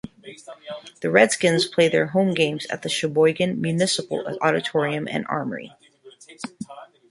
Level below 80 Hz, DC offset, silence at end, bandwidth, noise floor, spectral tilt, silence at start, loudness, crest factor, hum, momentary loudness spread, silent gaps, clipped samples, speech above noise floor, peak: -64 dBFS; under 0.1%; 0.25 s; 11.5 kHz; -49 dBFS; -4.5 dB/octave; 0.05 s; -21 LUFS; 22 dB; none; 19 LU; none; under 0.1%; 27 dB; -2 dBFS